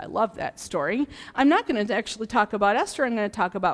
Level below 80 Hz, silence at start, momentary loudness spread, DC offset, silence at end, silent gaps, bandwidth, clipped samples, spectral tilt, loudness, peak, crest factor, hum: -56 dBFS; 0 s; 8 LU; under 0.1%; 0 s; none; 11 kHz; under 0.1%; -4.5 dB/octave; -25 LUFS; -8 dBFS; 16 dB; none